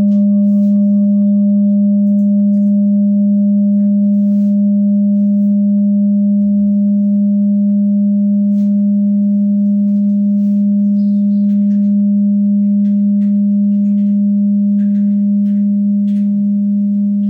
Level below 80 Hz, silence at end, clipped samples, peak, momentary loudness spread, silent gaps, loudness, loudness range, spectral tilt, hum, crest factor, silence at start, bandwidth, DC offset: -62 dBFS; 0 s; under 0.1%; -6 dBFS; 2 LU; none; -12 LUFS; 1 LU; -13 dB/octave; none; 6 dB; 0 s; 0.7 kHz; under 0.1%